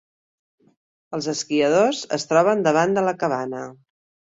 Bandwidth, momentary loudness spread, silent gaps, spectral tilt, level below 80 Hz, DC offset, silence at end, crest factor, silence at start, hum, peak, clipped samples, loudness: 8 kHz; 13 LU; none; -4.5 dB/octave; -66 dBFS; under 0.1%; 0.55 s; 18 dB; 1.1 s; none; -4 dBFS; under 0.1%; -21 LUFS